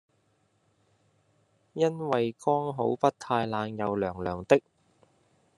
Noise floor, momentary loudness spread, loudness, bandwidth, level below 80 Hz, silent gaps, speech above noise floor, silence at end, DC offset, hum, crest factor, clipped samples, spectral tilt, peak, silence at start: -70 dBFS; 6 LU; -28 LUFS; 11.5 kHz; -70 dBFS; none; 43 dB; 1 s; under 0.1%; none; 26 dB; under 0.1%; -6.5 dB/octave; -6 dBFS; 1.75 s